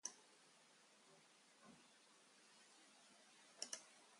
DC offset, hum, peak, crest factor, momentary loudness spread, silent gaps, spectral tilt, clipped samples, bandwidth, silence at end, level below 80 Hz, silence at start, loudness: under 0.1%; none; -30 dBFS; 32 dB; 17 LU; none; 0.5 dB/octave; under 0.1%; 11.5 kHz; 0 s; under -90 dBFS; 0.05 s; -60 LUFS